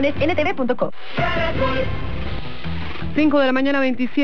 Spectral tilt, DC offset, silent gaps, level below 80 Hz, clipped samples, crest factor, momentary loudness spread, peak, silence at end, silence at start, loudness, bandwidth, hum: -7.5 dB/octave; 7%; none; -36 dBFS; under 0.1%; 14 dB; 12 LU; -6 dBFS; 0 s; 0 s; -21 LUFS; 6.4 kHz; none